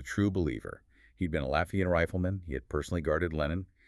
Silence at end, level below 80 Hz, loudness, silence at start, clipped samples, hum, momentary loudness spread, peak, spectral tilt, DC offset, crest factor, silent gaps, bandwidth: 0.25 s; -46 dBFS; -32 LUFS; 0 s; under 0.1%; none; 9 LU; -12 dBFS; -7 dB/octave; under 0.1%; 20 dB; none; 12.5 kHz